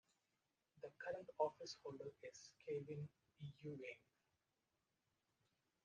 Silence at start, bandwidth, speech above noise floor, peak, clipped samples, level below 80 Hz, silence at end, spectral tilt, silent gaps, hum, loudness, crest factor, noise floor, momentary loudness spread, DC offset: 0.75 s; 9 kHz; 39 dB; -28 dBFS; under 0.1%; -90 dBFS; 1.85 s; -5.5 dB/octave; none; none; -52 LUFS; 26 dB; -90 dBFS; 14 LU; under 0.1%